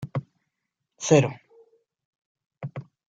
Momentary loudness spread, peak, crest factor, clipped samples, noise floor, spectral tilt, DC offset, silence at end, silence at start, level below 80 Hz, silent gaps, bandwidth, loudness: 21 LU; -4 dBFS; 24 dB; under 0.1%; -82 dBFS; -5.5 dB/octave; under 0.1%; 0.3 s; 0 s; -68 dBFS; 2.05-2.35 s, 2.46-2.50 s; 9.4 kHz; -23 LUFS